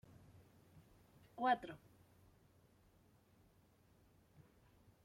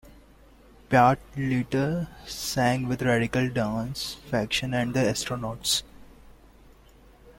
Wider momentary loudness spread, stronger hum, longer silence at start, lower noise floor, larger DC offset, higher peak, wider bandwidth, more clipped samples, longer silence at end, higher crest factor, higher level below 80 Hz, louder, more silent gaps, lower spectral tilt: first, 27 LU vs 10 LU; neither; first, 1.35 s vs 0.05 s; first, -72 dBFS vs -54 dBFS; neither; second, -24 dBFS vs -6 dBFS; about the same, 16.5 kHz vs 16.5 kHz; neither; first, 3.3 s vs 0.1 s; about the same, 24 dB vs 20 dB; second, -78 dBFS vs -50 dBFS; second, -40 LUFS vs -26 LUFS; neither; about the same, -5.5 dB/octave vs -4.5 dB/octave